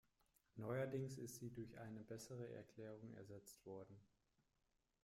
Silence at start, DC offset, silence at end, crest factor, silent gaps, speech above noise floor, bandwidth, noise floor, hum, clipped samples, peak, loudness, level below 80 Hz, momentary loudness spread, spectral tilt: 0.55 s; under 0.1%; 0.95 s; 18 dB; none; 35 dB; 16 kHz; -87 dBFS; none; under 0.1%; -36 dBFS; -53 LUFS; -82 dBFS; 13 LU; -6 dB/octave